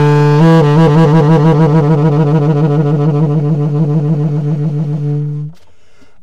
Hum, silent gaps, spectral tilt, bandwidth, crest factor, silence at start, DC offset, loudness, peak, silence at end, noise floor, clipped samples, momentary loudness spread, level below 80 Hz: none; none; -9 dB/octave; 7 kHz; 10 dB; 0 s; 2%; -10 LUFS; 0 dBFS; 0.7 s; -49 dBFS; under 0.1%; 9 LU; -40 dBFS